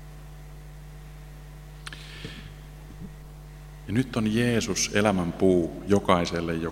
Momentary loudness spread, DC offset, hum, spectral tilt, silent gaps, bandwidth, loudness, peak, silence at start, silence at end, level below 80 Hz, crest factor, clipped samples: 22 LU; under 0.1%; none; -5 dB/octave; none; 16 kHz; -25 LUFS; -4 dBFS; 0 s; 0 s; -46 dBFS; 24 dB; under 0.1%